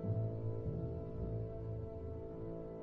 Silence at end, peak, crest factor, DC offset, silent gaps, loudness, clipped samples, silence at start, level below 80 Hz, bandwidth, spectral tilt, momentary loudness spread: 0 s; -28 dBFS; 14 dB; under 0.1%; none; -43 LUFS; under 0.1%; 0 s; -52 dBFS; 2.9 kHz; -12 dB/octave; 7 LU